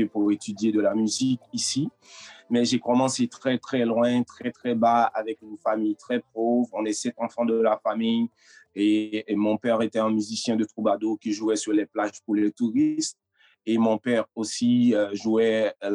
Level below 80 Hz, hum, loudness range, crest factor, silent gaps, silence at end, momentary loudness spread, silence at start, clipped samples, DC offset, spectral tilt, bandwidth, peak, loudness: -78 dBFS; none; 2 LU; 14 dB; none; 0 s; 7 LU; 0 s; under 0.1%; under 0.1%; -4.5 dB/octave; 11 kHz; -10 dBFS; -25 LUFS